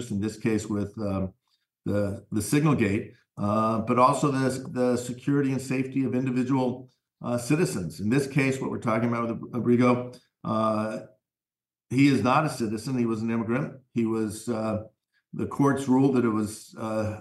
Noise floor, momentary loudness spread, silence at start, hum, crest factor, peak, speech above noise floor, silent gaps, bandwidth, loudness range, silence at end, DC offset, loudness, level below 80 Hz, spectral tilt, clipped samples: under -90 dBFS; 10 LU; 0 s; none; 18 dB; -8 dBFS; over 64 dB; none; 12.5 kHz; 3 LU; 0 s; under 0.1%; -26 LUFS; -64 dBFS; -6.5 dB/octave; under 0.1%